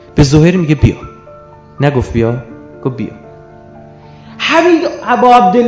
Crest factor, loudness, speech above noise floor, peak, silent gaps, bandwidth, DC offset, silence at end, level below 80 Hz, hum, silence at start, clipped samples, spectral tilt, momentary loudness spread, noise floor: 12 dB; -11 LUFS; 26 dB; 0 dBFS; none; 8 kHz; under 0.1%; 0 s; -28 dBFS; 50 Hz at -40 dBFS; 0.15 s; 1%; -6.5 dB/octave; 17 LU; -36 dBFS